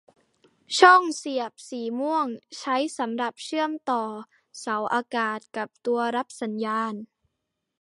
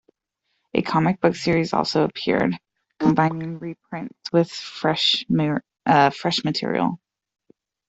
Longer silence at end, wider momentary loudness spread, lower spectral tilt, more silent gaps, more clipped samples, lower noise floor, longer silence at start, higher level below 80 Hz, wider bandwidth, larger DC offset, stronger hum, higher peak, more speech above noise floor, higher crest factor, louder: second, 0.75 s vs 0.9 s; first, 16 LU vs 13 LU; second, -3 dB/octave vs -5.5 dB/octave; neither; neither; first, -81 dBFS vs -75 dBFS; about the same, 0.7 s vs 0.75 s; second, -82 dBFS vs -58 dBFS; first, 11.5 kHz vs 8 kHz; neither; neither; about the same, -2 dBFS vs -4 dBFS; about the same, 56 dB vs 54 dB; about the same, 24 dB vs 20 dB; second, -25 LUFS vs -21 LUFS